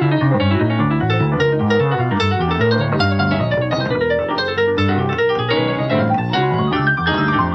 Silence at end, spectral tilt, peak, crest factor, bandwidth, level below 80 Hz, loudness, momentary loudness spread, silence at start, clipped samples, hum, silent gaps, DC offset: 0 s; -7.5 dB/octave; -4 dBFS; 12 dB; 7.8 kHz; -42 dBFS; -17 LUFS; 2 LU; 0 s; under 0.1%; none; none; under 0.1%